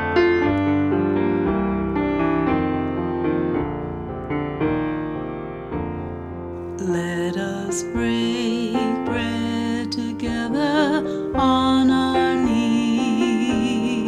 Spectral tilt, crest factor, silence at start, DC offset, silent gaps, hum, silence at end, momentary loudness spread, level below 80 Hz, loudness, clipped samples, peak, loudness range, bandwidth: -6 dB/octave; 16 dB; 0 s; under 0.1%; none; none; 0 s; 11 LU; -42 dBFS; -22 LUFS; under 0.1%; -6 dBFS; 7 LU; 12.5 kHz